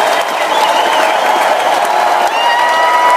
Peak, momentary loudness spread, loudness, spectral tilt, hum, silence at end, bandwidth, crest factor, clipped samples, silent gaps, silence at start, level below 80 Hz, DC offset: 0 dBFS; 2 LU; -11 LUFS; -0.5 dB/octave; none; 0 s; 16 kHz; 10 dB; under 0.1%; none; 0 s; -68 dBFS; under 0.1%